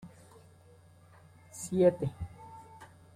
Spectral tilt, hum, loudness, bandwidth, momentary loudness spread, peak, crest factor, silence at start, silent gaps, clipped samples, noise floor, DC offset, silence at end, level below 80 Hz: -7 dB/octave; none; -30 LUFS; 15.5 kHz; 26 LU; -12 dBFS; 22 dB; 0.05 s; none; under 0.1%; -58 dBFS; under 0.1%; 0.3 s; -60 dBFS